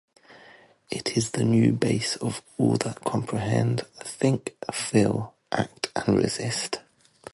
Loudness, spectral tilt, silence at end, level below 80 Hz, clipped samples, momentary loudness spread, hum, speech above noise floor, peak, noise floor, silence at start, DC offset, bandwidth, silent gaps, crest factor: -26 LUFS; -5.5 dB/octave; 0.55 s; -56 dBFS; under 0.1%; 9 LU; none; 28 dB; -8 dBFS; -53 dBFS; 0.3 s; under 0.1%; 11.5 kHz; none; 18 dB